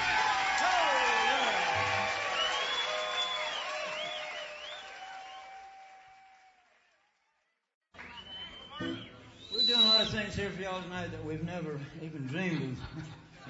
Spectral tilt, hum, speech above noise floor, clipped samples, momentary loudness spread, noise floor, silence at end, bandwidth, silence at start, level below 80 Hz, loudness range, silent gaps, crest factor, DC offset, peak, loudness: -3 dB/octave; none; 41 dB; under 0.1%; 19 LU; -78 dBFS; 0 s; 8 kHz; 0 s; -60 dBFS; 20 LU; 7.75-7.81 s; 20 dB; under 0.1%; -14 dBFS; -30 LUFS